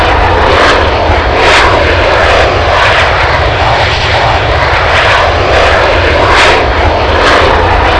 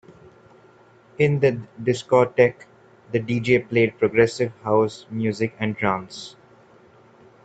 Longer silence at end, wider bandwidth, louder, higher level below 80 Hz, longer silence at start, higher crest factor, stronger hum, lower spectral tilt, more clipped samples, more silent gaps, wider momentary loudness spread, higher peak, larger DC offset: second, 0 s vs 1.15 s; first, 11 kHz vs 8.8 kHz; first, -6 LUFS vs -22 LUFS; first, -16 dBFS vs -58 dBFS; second, 0 s vs 1.2 s; second, 6 dB vs 22 dB; neither; second, -4.5 dB/octave vs -6.5 dB/octave; first, 2% vs under 0.1%; neither; second, 3 LU vs 9 LU; about the same, 0 dBFS vs -2 dBFS; first, 0.8% vs under 0.1%